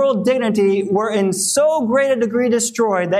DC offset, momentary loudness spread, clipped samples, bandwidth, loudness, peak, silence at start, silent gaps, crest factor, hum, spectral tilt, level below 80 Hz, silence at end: under 0.1%; 3 LU; under 0.1%; 15.5 kHz; -17 LUFS; -6 dBFS; 0 s; none; 12 dB; none; -4 dB/octave; -62 dBFS; 0 s